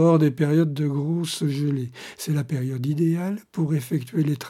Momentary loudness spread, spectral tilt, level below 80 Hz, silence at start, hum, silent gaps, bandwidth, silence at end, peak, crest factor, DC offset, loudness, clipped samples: 7 LU; -7 dB/octave; -68 dBFS; 0 s; none; none; 15 kHz; 0 s; -6 dBFS; 16 dB; under 0.1%; -24 LUFS; under 0.1%